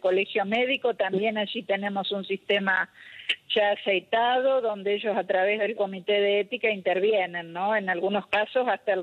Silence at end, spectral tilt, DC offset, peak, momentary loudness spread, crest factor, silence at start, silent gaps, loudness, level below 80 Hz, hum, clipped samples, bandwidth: 0 s; -6 dB/octave; under 0.1%; -12 dBFS; 6 LU; 14 dB; 0.05 s; none; -26 LUFS; -76 dBFS; none; under 0.1%; 9.2 kHz